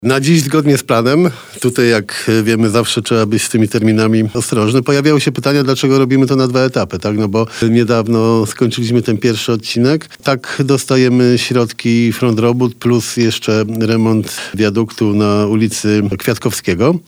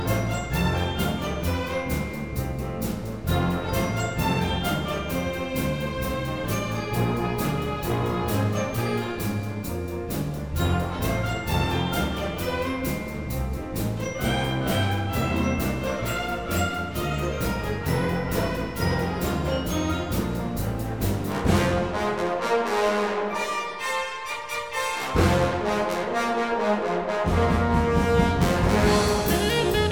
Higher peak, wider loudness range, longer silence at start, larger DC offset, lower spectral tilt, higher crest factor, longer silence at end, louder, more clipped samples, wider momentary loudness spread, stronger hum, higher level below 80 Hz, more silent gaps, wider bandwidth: first, 0 dBFS vs -6 dBFS; about the same, 2 LU vs 4 LU; about the same, 0 s vs 0 s; second, under 0.1% vs 0.4%; about the same, -5.5 dB/octave vs -5.5 dB/octave; second, 12 dB vs 18 dB; about the same, 0.1 s vs 0 s; first, -13 LUFS vs -26 LUFS; neither; about the same, 5 LU vs 7 LU; neither; second, -50 dBFS vs -36 dBFS; neither; about the same, over 20 kHz vs over 20 kHz